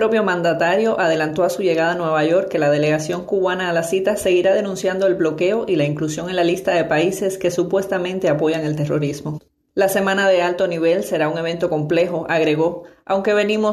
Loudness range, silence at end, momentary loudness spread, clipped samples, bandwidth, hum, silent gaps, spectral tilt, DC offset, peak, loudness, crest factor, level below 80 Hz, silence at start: 2 LU; 0 s; 5 LU; under 0.1%; 13.5 kHz; none; none; -5.5 dB/octave; under 0.1%; -6 dBFS; -19 LUFS; 12 dB; -56 dBFS; 0 s